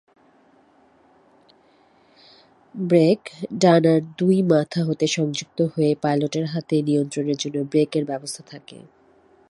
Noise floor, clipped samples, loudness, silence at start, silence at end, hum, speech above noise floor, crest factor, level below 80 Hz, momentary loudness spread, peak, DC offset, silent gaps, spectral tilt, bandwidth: -57 dBFS; under 0.1%; -21 LUFS; 2.75 s; 0.75 s; none; 36 dB; 20 dB; -66 dBFS; 14 LU; -2 dBFS; under 0.1%; none; -6 dB/octave; 11.5 kHz